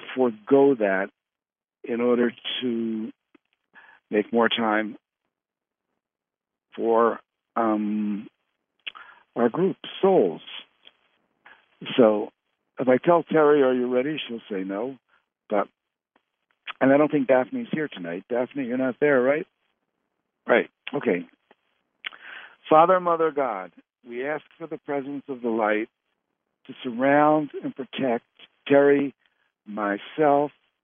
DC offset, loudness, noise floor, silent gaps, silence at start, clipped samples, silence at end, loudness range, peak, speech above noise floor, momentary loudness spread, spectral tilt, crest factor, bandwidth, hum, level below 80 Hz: under 0.1%; -23 LUFS; under -90 dBFS; none; 0 s; under 0.1%; 0.35 s; 5 LU; -4 dBFS; over 67 dB; 19 LU; -9.5 dB/octave; 22 dB; 3.7 kHz; none; -82 dBFS